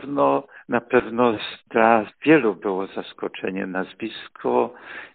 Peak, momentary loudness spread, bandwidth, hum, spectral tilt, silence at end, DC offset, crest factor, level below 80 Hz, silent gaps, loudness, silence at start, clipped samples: 0 dBFS; 14 LU; 4.6 kHz; none; -4 dB/octave; 0.1 s; under 0.1%; 22 dB; -62 dBFS; none; -22 LUFS; 0 s; under 0.1%